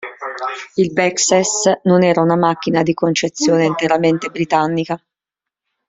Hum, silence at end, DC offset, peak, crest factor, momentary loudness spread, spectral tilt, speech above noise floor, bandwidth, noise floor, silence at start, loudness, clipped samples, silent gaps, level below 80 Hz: none; 0.9 s; under 0.1%; 0 dBFS; 16 dB; 11 LU; -4.5 dB/octave; 70 dB; 8.2 kHz; -85 dBFS; 0 s; -16 LUFS; under 0.1%; none; -58 dBFS